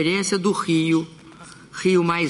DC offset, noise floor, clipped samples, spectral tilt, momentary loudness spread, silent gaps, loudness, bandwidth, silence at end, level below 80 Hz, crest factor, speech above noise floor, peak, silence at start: under 0.1%; -44 dBFS; under 0.1%; -5 dB/octave; 12 LU; none; -21 LUFS; 11.5 kHz; 0 s; -62 dBFS; 16 dB; 23 dB; -6 dBFS; 0 s